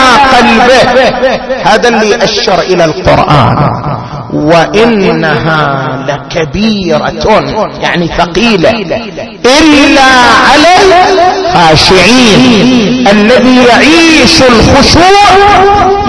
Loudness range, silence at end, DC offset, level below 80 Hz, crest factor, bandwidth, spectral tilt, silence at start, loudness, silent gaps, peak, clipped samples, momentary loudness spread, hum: 6 LU; 0 s; under 0.1%; -24 dBFS; 4 dB; 11 kHz; -4.5 dB/octave; 0 s; -4 LUFS; none; 0 dBFS; 10%; 9 LU; none